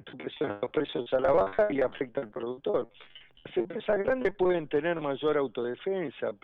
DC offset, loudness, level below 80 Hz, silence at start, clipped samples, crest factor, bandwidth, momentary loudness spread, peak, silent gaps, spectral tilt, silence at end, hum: under 0.1%; -30 LUFS; -58 dBFS; 0.05 s; under 0.1%; 16 dB; 5.2 kHz; 10 LU; -14 dBFS; none; -8 dB/octave; 0.1 s; none